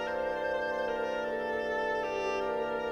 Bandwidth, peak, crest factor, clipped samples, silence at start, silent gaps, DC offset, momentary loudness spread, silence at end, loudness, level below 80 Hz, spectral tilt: 12.5 kHz; -20 dBFS; 12 dB; under 0.1%; 0 s; none; under 0.1%; 1 LU; 0 s; -33 LUFS; -60 dBFS; -4 dB/octave